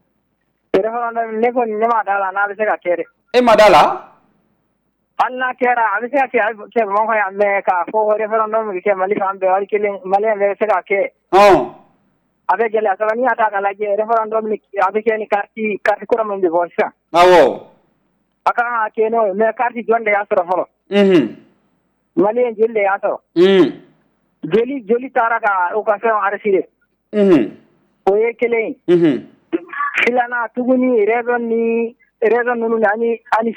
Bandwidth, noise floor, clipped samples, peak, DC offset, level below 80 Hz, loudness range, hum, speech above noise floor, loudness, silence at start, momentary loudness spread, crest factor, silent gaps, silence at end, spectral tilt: 15 kHz; -66 dBFS; under 0.1%; -4 dBFS; under 0.1%; -54 dBFS; 3 LU; none; 51 dB; -16 LUFS; 0.75 s; 8 LU; 12 dB; none; 0 s; -6 dB/octave